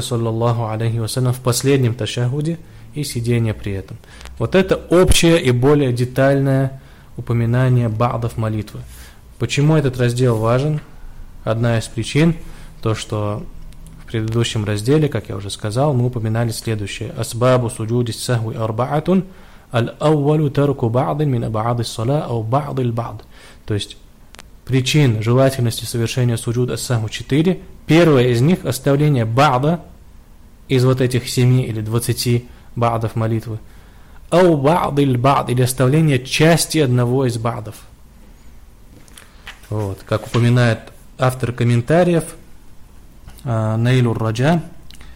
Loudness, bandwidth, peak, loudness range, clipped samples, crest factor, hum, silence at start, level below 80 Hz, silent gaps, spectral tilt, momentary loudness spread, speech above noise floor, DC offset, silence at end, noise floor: -17 LUFS; 16 kHz; -4 dBFS; 5 LU; under 0.1%; 14 dB; none; 0 s; -38 dBFS; none; -6 dB/octave; 12 LU; 25 dB; under 0.1%; 0 s; -42 dBFS